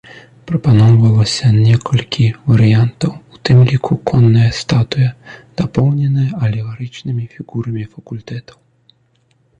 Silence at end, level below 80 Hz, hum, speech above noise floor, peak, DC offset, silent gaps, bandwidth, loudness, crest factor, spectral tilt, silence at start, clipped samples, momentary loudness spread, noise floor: 1.2 s; -42 dBFS; none; 44 dB; -2 dBFS; under 0.1%; none; 9.2 kHz; -14 LUFS; 10 dB; -7 dB/octave; 0.15 s; under 0.1%; 15 LU; -57 dBFS